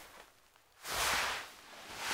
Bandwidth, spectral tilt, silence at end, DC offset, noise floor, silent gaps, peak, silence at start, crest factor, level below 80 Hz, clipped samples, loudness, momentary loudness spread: 16 kHz; 0 dB/octave; 0 s; under 0.1%; -65 dBFS; none; -22 dBFS; 0 s; 18 dB; -62 dBFS; under 0.1%; -35 LUFS; 21 LU